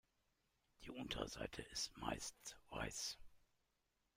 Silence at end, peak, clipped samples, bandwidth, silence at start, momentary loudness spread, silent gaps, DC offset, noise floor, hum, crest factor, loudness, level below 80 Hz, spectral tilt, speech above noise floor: 0.8 s; -28 dBFS; under 0.1%; 16 kHz; 0.8 s; 11 LU; none; under 0.1%; -86 dBFS; none; 24 dB; -48 LUFS; -64 dBFS; -2.5 dB/octave; 37 dB